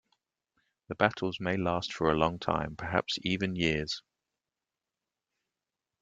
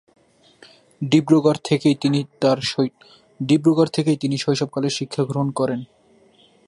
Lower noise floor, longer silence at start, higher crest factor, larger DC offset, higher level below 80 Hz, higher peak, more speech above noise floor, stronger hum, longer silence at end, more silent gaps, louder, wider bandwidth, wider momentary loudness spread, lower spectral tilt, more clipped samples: first, -90 dBFS vs -55 dBFS; about the same, 0.9 s vs 1 s; first, 26 dB vs 18 dB; neither; first, -56 dBFS vs -64 dBFS; second, -6 dBFS vs -2 dBFS; first, 59 dB vs 35 dB; neither; first, 2 s vs 0.85 s; neither; second, -31 LUFS vs -20 LUFS; second, 8.8 kHz vs 11.5 kHz; second, 5 LU vs 8 LU; about the same, -5.5 dB/octave vs -6 dB/octave; neither